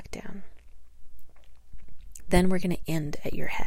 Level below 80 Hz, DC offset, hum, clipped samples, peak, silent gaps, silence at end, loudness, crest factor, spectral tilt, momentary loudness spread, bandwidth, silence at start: -42 dBFS; under 0.1%; none; under 0.1%; -4 dBFS; none; 0 s; -29 LUFS; 20 dB; -6 dB/octave; 24 LU; 16 kHz; 0 s